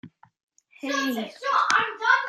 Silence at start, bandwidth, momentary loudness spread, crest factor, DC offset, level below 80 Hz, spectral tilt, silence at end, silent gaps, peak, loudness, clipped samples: 0.05 s; 13.5 kHz; 9 LU; 22 dB; under 0.1%; -80 dBFS; -2 dB/octave; 0 s; 0.43-0.48 s; -2 dBFS; -24 LUFS; under 0.1%